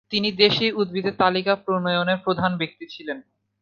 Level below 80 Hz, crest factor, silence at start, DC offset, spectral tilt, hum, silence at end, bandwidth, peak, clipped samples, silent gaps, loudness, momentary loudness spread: -62 dBFS; 20 dB; 0.1 s; under 0.1%; -6.5 dB/octave; none; 0.4 s; 7 kHz; -2 dBFS; under 0.1%; none; -21 LUFS; 15 LU